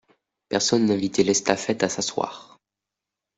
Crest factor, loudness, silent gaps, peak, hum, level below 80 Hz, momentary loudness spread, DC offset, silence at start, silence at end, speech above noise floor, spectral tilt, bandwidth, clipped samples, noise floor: 24 dB; -23 LUFS; none; 0 dBFS; none; -62 dBFS; 9 LU; under 0.1%; 0.5 s; 0.95 s; 64 dB; -3.5 dB/octave; 8.2 kHz; under 0.1%; -87 dBFS